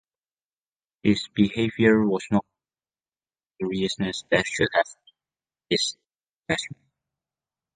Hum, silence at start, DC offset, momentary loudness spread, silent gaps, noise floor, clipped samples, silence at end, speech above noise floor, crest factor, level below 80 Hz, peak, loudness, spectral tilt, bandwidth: none; 1.05 s; under 0.1%; 9 LU; 6.29-6.33 s; under -90 dBFS; under 0.1%; 1 s; over 67 dB; 22 dB; -56 dBFS; -4 dBFS; -24 LUFS; -5 dB/octave; 9.6 kHz